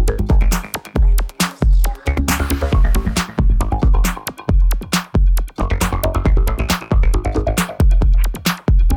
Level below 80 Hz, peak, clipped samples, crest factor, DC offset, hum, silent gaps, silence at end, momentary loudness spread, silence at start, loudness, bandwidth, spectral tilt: -16 dBFS; -4 dBFS; under 0.1%; 10 dB; under 0.1%; none; none; 0 s; 4 LU; 0 s; -18 LUFS; 18 kHz; -5 dB/octave